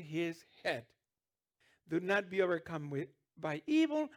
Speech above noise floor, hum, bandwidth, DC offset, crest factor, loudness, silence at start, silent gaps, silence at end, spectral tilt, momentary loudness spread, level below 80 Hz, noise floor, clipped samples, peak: over 54 dB; none; 12 kHz; under 0.1%; 18 dB; -36 LUFS; 0 s; none; 0 s; -6 dB/octave; 11 LU; -80 dBFS; under -90 dBFS; under 0.1%; -18 dBFS